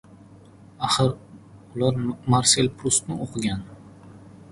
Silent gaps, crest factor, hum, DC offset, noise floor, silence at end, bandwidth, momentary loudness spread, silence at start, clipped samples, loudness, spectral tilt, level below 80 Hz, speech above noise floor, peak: none; 24 dB; none; under 0.1%; -48 dBFS; 0.15 s; 11.5 kHz; 16 LU; 0.8 s; under 0.1%; -23 LUFS; -4 dB/octave; -50 dBFS; 26 dB; -2 dBFS